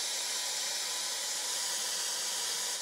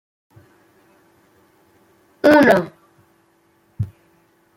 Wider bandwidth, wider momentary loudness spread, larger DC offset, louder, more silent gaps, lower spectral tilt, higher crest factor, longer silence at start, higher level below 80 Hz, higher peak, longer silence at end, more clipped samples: about the same, 16 kHz vs 16.5 kHz; second, 1 LU vs 18 LU; neither; second, -32 LUFS vs -16 LUFS; neither; second, 3 dB/octave vs -6.5 dB/octave; second, 14 dB vs 20 dB; second, 0 s vs 2.25 s; second, -80 dBFS vs -56 dBFS; second, -20 dBFS vs -2 dBFS; second, 0 s vs 0.7 s; neither